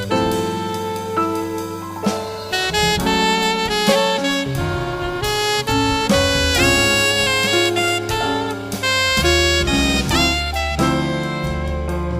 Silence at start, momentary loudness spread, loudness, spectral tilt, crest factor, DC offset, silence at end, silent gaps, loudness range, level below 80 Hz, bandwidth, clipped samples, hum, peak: 0 s; 9 LU; -17 LUFS; -3.5 dB/octave; 18 dB; under 0.1%; 0 s; none; 3 LU; -30 dBFS; 15.5 kHz; under 0.1%; none; 0 dBFS